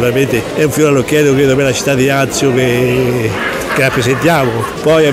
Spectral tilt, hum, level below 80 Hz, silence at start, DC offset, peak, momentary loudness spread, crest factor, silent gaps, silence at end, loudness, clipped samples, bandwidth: -5 dB/octave; none; -38 dBFS; 0 s; under 0.1%; 0 dBFS; 4 LU; 12 dB; none; 0 s; -12 LUFS; under 0.1%; 16 kHz